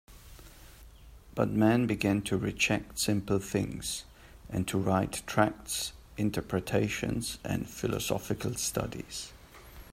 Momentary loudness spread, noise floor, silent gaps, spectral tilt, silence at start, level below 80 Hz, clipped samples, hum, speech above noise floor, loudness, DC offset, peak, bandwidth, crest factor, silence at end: 11 LU; -52 dBFS; none; -4.5 dB/octave; 0.1 s; -52 dBFS; under 0.1%; none; 21 dB; -31 LUFS; under 0.1%; -10 dBFS; 16 kHz; 20 dB; 0.05 s